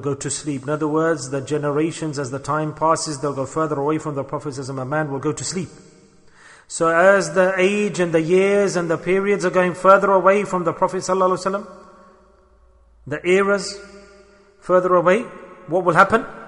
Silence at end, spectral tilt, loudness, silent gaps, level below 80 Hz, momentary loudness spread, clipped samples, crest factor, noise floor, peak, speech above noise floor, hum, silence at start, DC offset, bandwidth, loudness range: 0 s; -5 dB/octave; -19 LUFS; none; -56 dBFS; 13 LU; under 0.1%; 20 dB; -53 dBFS; 0 dBFS; 34 dB; none; 0 s; under 0.1%; 11 kHz; 7 LU